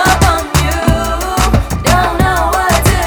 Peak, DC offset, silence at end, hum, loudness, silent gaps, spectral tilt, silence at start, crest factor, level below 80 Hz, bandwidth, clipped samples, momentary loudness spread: 0 dBFS; under 0.1%; 0 s; none; -12 LUFS; none; -4.5 dB/octave; 0 s; 12 dB; -18 dBFS; over 20 kHz; under 0.1%; 3 LU